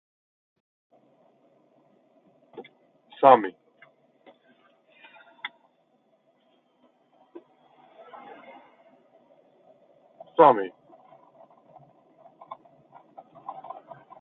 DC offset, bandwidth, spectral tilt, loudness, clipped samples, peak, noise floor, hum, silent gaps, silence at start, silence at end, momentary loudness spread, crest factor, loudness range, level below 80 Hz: under 0.1%; 4.1 kHz; -3.5 dB/octave; -22 LUFS; under 0.1%; 0 dBFS; -67 dBFS; none; none; 2.55 s; 0.7 s; 30 LU; 30 dB; 22 LU; -84 dBFS